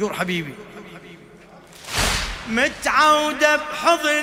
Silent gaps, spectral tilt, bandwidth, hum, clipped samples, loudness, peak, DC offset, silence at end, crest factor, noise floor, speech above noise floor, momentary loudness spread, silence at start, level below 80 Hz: none; -3 dB/octave; 16.5 kHz; none; under 0.1%; -19 LUFS; -2 dBFS; under 0.1%; 0 s; 20 dB; -45 dBFS; 26 dB; 23 LU; 0 s; -40 dBFS